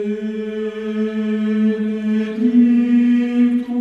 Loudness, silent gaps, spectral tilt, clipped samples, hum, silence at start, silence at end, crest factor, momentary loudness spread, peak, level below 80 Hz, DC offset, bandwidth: -17 LUFS; none; -8 dB/octave; under 0.1%; none; 0 s; 0 s; 12 dB; 10 LU; -4 dBFS; -64 dBFS; under 0.1%; 5.4 kHz